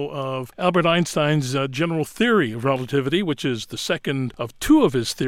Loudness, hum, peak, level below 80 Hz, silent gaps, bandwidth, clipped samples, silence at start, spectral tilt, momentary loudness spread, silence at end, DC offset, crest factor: -21 LUFS; none; -4 dBFS; -48 dBFS; none; 16.5 kHz; under 0.1%; 0 s; -5.5 dB/octave; 9 LU; 0 s; under 0.1%; 18 dB